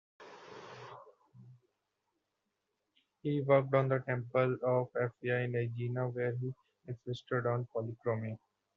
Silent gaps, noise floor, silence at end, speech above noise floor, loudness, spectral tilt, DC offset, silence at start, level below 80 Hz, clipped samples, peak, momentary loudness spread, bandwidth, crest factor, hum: none; -85 dBFS; 0.4 s; 52 dB; -34 LUFS; -7 dB/octave; under 0.1%; 0.2 s; -76 dBFS; under 0.1%; -14 dBFS; 21 LU; 6.6 kHz; 22 dB; none